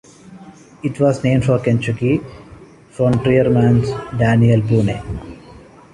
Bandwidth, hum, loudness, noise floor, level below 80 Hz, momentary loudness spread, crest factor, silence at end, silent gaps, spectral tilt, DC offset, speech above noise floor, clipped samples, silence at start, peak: 11 kHz; none; -16 LUFS; -41 dBFS; -40 dBFS; 13 LU; 14 dB; 0.35 s; none; -8 dB/octave; under 0.1%; 26 dB; under 0.1%; 0.25 s; -2 dBFS